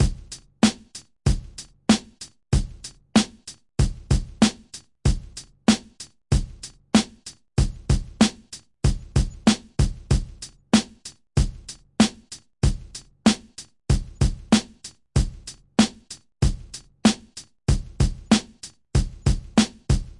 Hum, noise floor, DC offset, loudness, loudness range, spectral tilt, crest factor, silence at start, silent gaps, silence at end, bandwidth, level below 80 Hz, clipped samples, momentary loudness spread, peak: none; -46 dBFS; under 0.1%; -24 LUFS; 2 LU; -5 dB/octave; 20 dB; 0 s; none; 0.1 s; 11.5 kHz; -30 dBFS; under 0.1%; 19 LU; -4 dBFS